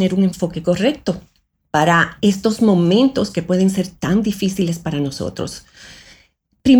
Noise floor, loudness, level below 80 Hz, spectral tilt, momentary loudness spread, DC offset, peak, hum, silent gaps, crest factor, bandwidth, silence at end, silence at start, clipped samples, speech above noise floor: -56 dBFS; -18 LUFS; -46 dBFS; -6 dB/octave; 11 LU; under 0.1%; -2 dBFS; none; none; 16 dB; 17 kHz; 0 s; 0 s; under 0.1%; 39 dB